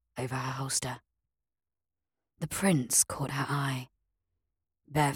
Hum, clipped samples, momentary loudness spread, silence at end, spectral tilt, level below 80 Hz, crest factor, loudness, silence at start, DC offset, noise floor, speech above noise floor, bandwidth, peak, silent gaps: none; under 0.1%; 15 LU; 0 s; -3.5 dB/octave; -62 dBFS; 22 dB; -30 LUFS; 0.15 s; under 0.1%; under -90 dBFS; over 60 dB; 17.5 kHz; -10 dBFS; none